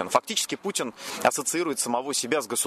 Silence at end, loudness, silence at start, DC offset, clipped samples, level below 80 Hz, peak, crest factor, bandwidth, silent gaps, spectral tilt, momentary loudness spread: 0 s; -26 LUFS; 0 s; under 0.1%; under 0.1%; -72 dBFS; -6 dBFS; 20 dB; 13.5 kHz; none; -1.5 dB/octave; 5 LU